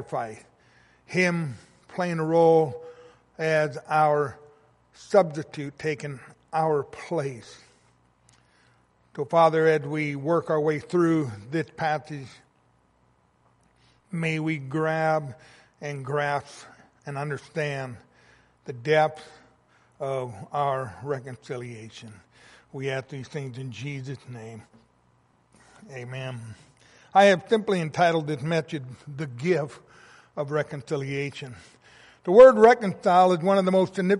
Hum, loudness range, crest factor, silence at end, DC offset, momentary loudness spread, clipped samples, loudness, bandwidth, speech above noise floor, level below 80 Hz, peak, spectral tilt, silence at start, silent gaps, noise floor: none; 13 LU; 22 dB; 0 s; under 0.1%; 21 LU; under 0.1%; -24 LUFS; 11.5 kHz; 40 dB; -66 dBFS; -4 dBFS; -6.5 dB/octave; 0 s; none; -64 dBFS